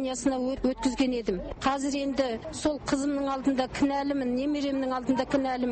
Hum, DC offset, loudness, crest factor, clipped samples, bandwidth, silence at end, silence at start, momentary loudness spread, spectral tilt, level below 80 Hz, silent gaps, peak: none; under 0.1%; -28 LUFS; 14 dB; under 0.1%; 8.8 kHz; 0 s; 0 s; 3 LU; -4.5 dB/octave; -48 dBFS; none; -12 dBFS